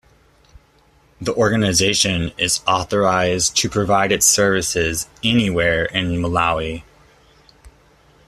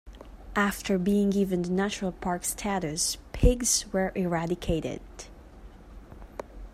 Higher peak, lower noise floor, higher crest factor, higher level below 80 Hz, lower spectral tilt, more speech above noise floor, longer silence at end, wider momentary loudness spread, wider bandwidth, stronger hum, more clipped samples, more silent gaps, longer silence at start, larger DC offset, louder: first, -2 dBFS vs -8 dBFS; first, -55 dBFS vs -48 dBFS; about the same, 18 dB vs 20 dB; about the same, -42 dBFS vs -38 dBFS; second, -3 dB/octave vs -4.5 dB/octave; first, 37 dB vs 20 dB; first, 0.6 s vs 0.05 s; second, 8 LU vs 19 LU; second, 14.5 kHz vs 16 kHz; neither; neither; neither; first, 1.2 s vs 0.05 s; neither; first, -17 LUFS vs -28 LUFS